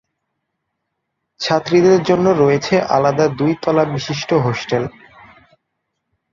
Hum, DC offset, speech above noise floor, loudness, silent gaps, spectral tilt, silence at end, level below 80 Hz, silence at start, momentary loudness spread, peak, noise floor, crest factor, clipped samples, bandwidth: none; under 0.1%; 60 dB; -16 LUFS; none; -6 dB/octave; 1.45 s; -54 dBFS; 1.4 s; 9 LU; -2 dBFS; -75 dBFS; 16 dB; under 0.1%; 7.4 kHz